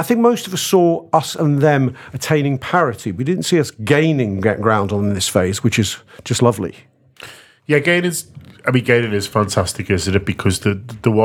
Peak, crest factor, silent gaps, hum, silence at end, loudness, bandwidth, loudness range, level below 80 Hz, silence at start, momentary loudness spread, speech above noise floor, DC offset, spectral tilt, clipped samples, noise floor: 0 dBFS; 16 dB; none; none; 0 s; -17 LUFS; 19 kHz; 2 LU; -48 dBFS; 0 s; 9 LU; 23 dB; under 0.1%; -5 dB/octave; under 0.1%; -40 dBFS